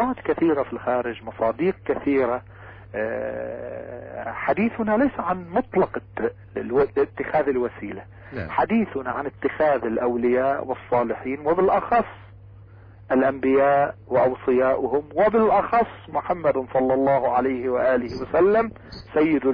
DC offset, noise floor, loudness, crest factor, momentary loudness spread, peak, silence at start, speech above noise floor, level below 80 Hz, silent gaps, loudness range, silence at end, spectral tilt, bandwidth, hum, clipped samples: under 0.1%; -45 dBFS; -23 LUFS; 12 dB; 11 LU; -10 dBFS; 0 s; 23 dB; -50 dBFS; none; 5 LU; 0 s; -9.5 dB/octave; 5.4 kHz; none; under 0.1%